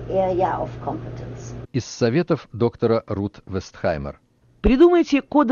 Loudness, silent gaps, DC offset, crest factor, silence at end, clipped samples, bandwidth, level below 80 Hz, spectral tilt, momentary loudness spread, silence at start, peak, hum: -21 LUFS; none; under 0.1%; 16 dB; 0 s; under 0.1%; 7.2 kHz; -38 dBFS; -7 dB/octave; 17 LU; 0 s; -4 dBFS; none